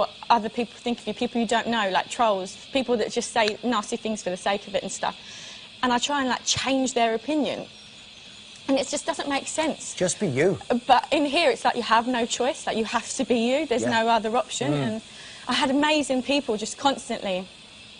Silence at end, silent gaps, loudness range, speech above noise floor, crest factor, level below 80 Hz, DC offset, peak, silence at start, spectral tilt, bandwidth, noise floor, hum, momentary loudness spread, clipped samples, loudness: 0 s; none; 4 LU; 21 dB; 20 dB; -60 dBFS; under 0.1%; -6 dBFS; 0 s; -3.5 dB/octave; 10.5 kHz; -45 dBFS; none; 12 LU; under 0.1%; -24 LUFS